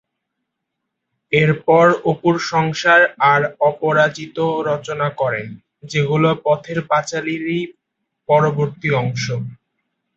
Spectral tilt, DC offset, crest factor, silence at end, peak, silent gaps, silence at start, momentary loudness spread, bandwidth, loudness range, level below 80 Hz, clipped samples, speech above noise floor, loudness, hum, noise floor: -6 dB/octave; under 0.1%; 18 dB; 0.6 s; 0 dBFS; none; 1.3 s; 11 LU; 8 kHz; 5 LU; -58 dBFS; under 0.1%; 61 dB; -17 LUFS; none; -77 dBFS